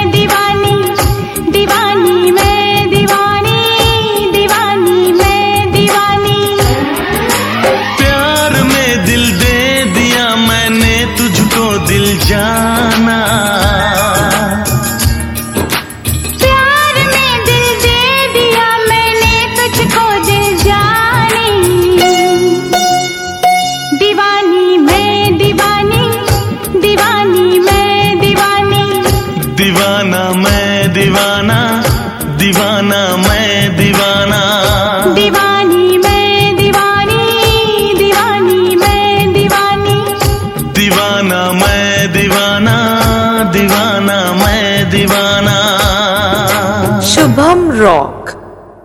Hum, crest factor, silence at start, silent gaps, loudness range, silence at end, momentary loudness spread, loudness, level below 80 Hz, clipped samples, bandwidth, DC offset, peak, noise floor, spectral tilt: none; 10 dB; 0 s; none; 2 LU; 0.15 s; 4 LU; -9 LUFS; -26 dBFS; 0.1%; 20 kHz; under 0.1%; 0 dBFS; -31 dBFS; -4 dB/octave